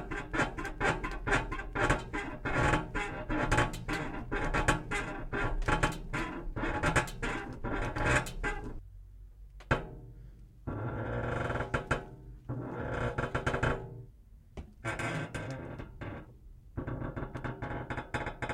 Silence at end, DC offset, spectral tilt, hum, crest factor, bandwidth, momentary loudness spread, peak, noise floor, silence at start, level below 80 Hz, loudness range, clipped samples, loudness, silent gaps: 0 s; under 0.1%; -5.5 dB/octave; none; 22 dB; 14.5 kHz; 18 LU; -12 dBFS; -55 dBFS; 0 s; -42 dBFS; 8 LU; under 0.1%; -34 LUFS; none